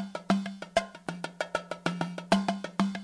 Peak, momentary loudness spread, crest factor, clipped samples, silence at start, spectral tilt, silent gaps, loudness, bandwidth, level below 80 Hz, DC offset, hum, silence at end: -12 dBFS; 9 LU; 18 dB; under 0.1%; 0 s; -5.5 dB/octave; none; -32 LUFS; 11 kHz; -64 dBFS; under 0.1%; none; 0 s